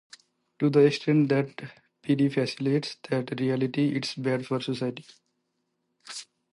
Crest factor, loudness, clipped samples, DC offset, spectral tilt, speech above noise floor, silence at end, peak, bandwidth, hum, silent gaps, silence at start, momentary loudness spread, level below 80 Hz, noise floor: 18 dB; -26 LUFS; under 0.1%; under 0.1%; -6.5 dB/octave; 52 dB; 0.3 s; -8 dBFS; 11.5 kHz; none; none; 0.6 s; 19 LU; -74 dBFS; -77 dBFS